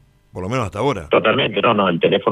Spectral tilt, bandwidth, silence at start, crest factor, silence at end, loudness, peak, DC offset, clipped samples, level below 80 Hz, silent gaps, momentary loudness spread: -6 dB/octave; 11.5 kHz; 0.35 s; 16 dB; 0 s; -17 LUFS; -2 dBFS; under 0.1%; under 0.1%; -48 dBFS; none; 9 LU